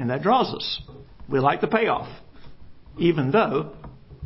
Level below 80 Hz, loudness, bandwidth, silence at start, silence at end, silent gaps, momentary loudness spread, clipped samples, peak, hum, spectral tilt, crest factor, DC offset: -52 dBFS; -23 LUFS; 5.8 kHz; 0 s; 0 s; none; 9 LU; under 0.1%; -6 dBFS; none; -10 dB/octave; 18 dB; under 0.1%